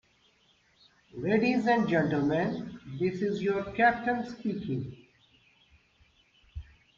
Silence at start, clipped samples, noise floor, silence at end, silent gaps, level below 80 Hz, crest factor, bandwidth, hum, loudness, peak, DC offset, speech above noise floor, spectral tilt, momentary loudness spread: 1.15 s; under 0.1%; -67 dBFS; 0.35 s; none; -58 dBFS; 20 dB; 7.4 kHz; none; -29 LUFS; -12 dBFS; under 0.1%; 38 dB; -7.5 dB/octave; 21 LU